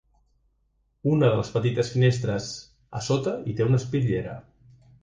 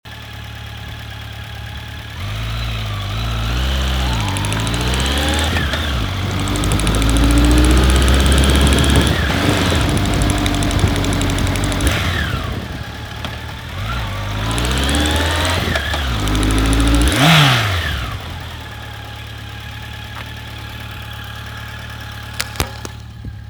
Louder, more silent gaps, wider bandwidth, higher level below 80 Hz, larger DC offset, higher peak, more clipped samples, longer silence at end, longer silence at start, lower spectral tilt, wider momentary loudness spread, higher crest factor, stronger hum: second, -25 LUFS vs -17 LUFS; neither; second, 9.2 kHz vs over 20 kHz; second, -52 dBFS vs -22 dBFS; neither; second, -8 dBFS vs 0 dBFS; neither; first, 0.6 s vs 0 s; first, 1.05 s vs 0.05 s; first, -6.5 dB/octave vs -4.5 dB/octave; about the same, 15 LU vs 17 LU; about the same, 18 dB vs 18 dB; neither